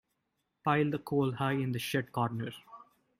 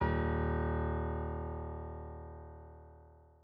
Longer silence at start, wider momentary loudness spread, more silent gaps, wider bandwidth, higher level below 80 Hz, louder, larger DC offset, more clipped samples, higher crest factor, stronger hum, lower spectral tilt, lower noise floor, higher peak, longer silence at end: first, 0.65 s vs 0 s; second, 10 LU vs 20 LU; neither; first, 16 kHz vs 4.6 kHz; second, -70 dBFS vs -44 dBFS; first, -33 LUFS vs -37 LUFS; neither; neither; about the same, 18 dB vs 16 dB; neither; about the same, -6.5 dB/octave vs -7.5 dB/octave; first, -82 dBFS vs -59 dBFS; first, -14 dBFS vs -20 dBFS; first, 0.35 s vs 0.2 s